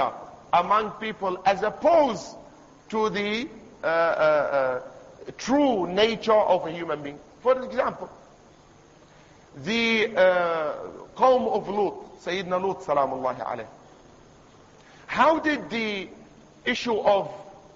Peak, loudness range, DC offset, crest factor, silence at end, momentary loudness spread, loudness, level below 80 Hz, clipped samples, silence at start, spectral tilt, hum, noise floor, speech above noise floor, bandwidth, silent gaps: -8 dBFS; 5 LU; under 0.1%; 18 dB; 0.15 s; 16 LU; -24 LUFS; -60 dBFS; under 0.1%; 0 s; -4.5 dB/octave; none; -53 dBFS; 29 dB; 7.8 kHz; none